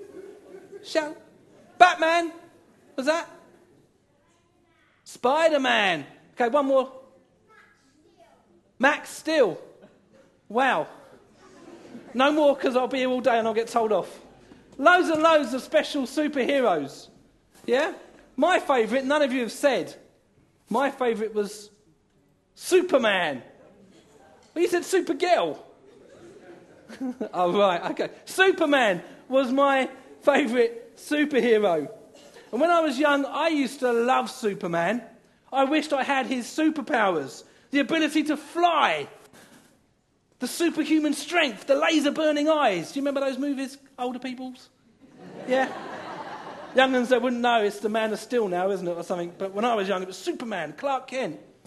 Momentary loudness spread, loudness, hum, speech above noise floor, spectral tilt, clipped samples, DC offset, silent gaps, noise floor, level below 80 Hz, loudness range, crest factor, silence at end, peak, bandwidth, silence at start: 15 LU; -24 LUFS; none; 43 dB; -4 dB/octave; under 0.1%; under 0.1%; none; -66 dBFS; -72 dBFS; 5 LU; 24 dB; 0.3 s; 0 dBFS; 12.5 kHz; 0 s